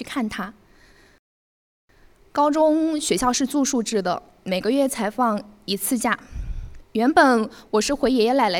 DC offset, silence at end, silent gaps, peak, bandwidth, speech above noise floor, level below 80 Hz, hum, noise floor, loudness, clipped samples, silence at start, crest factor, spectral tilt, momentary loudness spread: under 0.1%; 0 s; 1.19-1.88 s; -4 dBFS; 18 kHz; 32 dB; -42 dBFS; none; -53 dBFS; -21 LUFS; under 0.1%; 0 s; 20 dB; -3.5 dB/octave; 12 LU